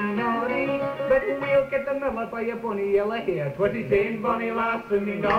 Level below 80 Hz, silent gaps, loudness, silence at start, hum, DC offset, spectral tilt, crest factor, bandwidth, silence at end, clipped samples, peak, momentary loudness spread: -52 dBFS; none; -25 LUFS; 0 s; none; under 0.1%; -7.5 dB/octave; 16 dB; 15 kHz; 0 s; under 0.1%; -10 dBFS; 5 LU